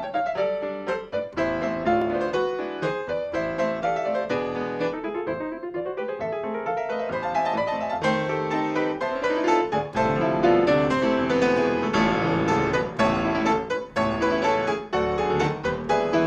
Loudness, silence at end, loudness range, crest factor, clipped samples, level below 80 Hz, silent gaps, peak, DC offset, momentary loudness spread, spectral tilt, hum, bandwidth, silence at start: -24 LUFS; 0 s; 6 LU; 16 dB; under 0.1%; -50 dBFS; none; -8 dBFS; under 0.1%; 7 LU; -6 dB/octave; none; 9.2 kHz; 0 s